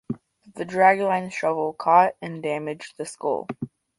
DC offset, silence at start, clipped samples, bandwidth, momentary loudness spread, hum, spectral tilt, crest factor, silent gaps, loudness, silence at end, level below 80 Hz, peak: under 0.1%; 0.1 s; under 0.1%; 11.5 kHz; 17 LU; none; -5.5 dB/octave; 20 dB; none; -23 LUFS; 0.3 s; -68 dBFS; -4 dBFS